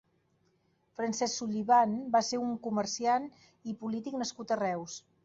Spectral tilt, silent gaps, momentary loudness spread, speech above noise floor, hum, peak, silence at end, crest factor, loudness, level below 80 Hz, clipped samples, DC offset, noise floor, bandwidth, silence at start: -4 dB/octave; none; 16 LU; 41 dB; none; -14 dBFS; 0.25 s; 18 dB; -31 LUFS; -74 dBFS; under 0.1%; under 0.1%; -72 dBFS; 8 kHz; 1 s